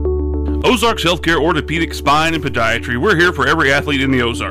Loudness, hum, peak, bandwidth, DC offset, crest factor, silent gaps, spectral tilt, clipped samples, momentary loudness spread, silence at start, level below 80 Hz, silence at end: -15 LUFS; none; -6 dBFS; 16 kHz; under 0.1%; 10 dB; none; -5 dB/octave; under 0.1%; 5 LU; 0 s; -26 dBFS; 0 s